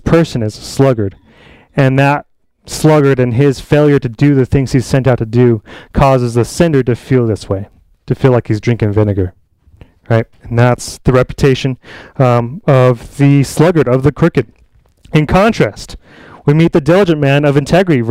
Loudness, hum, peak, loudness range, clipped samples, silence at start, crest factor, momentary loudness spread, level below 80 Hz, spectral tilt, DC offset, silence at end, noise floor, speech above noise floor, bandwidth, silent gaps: -12 LUFS; none; 0 dBFS; 3 LU; under 0.1%; 0.05 s; 12 dB; 9 LU; -32 dBFS; -7 dB/octave; under 0.1%; 0 s; -46 dBFS; 36 dB; 14.5 kHz; none